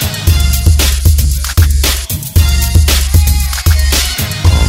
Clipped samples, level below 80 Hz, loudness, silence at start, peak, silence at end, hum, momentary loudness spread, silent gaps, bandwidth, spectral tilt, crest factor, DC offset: 0.4%; -12 dBFS; -11 LUFS; 0 s; 0 dBFS; 0 s; none; 3 LU; none; 16.5 kHz; -3.5 dB/octave; 10 dB; under 0.1%